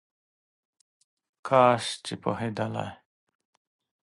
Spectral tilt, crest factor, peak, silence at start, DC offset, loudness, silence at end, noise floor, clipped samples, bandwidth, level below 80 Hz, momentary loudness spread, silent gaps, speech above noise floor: -5 dB/octave; 24 dB; -6 dBFS; 1.45 s; under 0.1%; -26 LUFS; 1.1 s; under -90 dBFS; under 0.1%; 11.5 kHz; -66 dBFS; 16 LU; none; over 64 dB